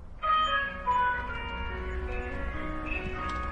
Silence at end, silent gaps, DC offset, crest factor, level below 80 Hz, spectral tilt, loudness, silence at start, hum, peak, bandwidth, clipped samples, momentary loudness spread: 0 s; none; under 0.1%; 14 dB; -38 dBFS; -5.5 dB/octave; -31 LUFS; 0 s; none; -16 dBFS; 9 kHz; under 0.1%; 10 LU